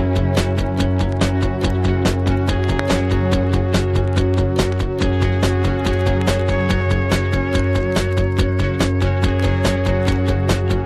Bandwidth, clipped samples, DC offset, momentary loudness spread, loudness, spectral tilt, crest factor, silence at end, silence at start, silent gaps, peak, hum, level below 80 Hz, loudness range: 13 kHz; under 0.1%; under 0.1%; 1 LU; -18 LUFS; -6.5 dB/octave; 14 dB; 0 s; 0 s; none; -4 dBFS; none; -24 dBFS; 0 LU